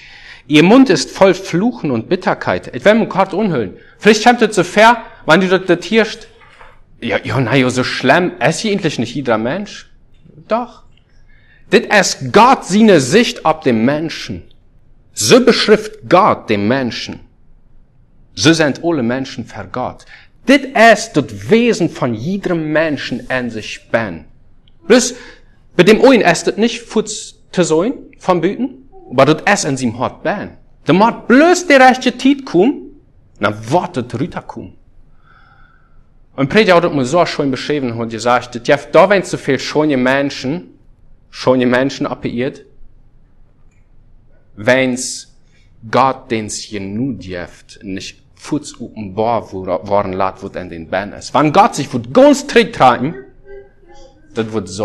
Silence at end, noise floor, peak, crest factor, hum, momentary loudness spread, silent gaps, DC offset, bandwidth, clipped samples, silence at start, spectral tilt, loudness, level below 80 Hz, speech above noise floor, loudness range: 0 s; -46 dBFS; 0 dBFS; 14 dB; none; 16 LU; none; under 0.1%; 12.5 kHz; 0.3%; 0.1 s; -4.5 dB/octave; -13 LUFS; -46 dBFS; 33 dB; 8 LU